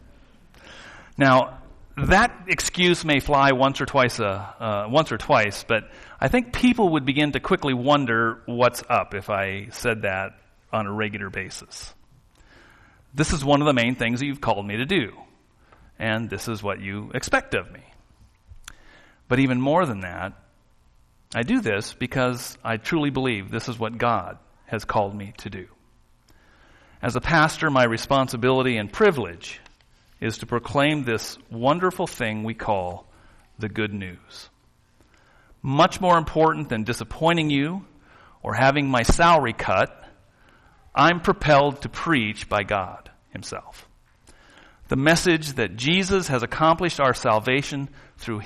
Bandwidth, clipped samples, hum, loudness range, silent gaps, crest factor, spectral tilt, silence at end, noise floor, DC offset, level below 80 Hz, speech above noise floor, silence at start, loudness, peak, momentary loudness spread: 13 kHz; under 0.1%; none; 8 LU; none; 18 dB; -5 dB/octave; 0 s; -59 dBFS; under 0.1%; -42 dBFS; 36 dB; 0.65 s; -22 LUFS; -6 dBFS; 16 LU